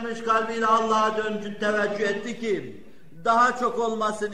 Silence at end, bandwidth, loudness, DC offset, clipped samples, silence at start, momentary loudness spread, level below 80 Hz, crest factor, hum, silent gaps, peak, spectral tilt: 0 s; 11.5 kHz; -24 LUFS; 0.8%; under 0.1%; 0 s; 9 LU; -60 dBFS; 16 dB; none; none; -8 dBFS; -4 dB/octave